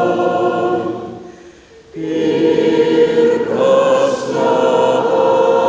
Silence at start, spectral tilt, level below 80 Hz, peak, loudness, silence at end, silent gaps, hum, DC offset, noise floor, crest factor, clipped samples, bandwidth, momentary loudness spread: 0 s; -5.5 dB/octave; -54 dBFS; -2 dBFS; -14 LUFS; 0 s; none; none; under 0.1%; -41 dBFS; 12 dB; under 0.1%; 8 kHz; 12 LU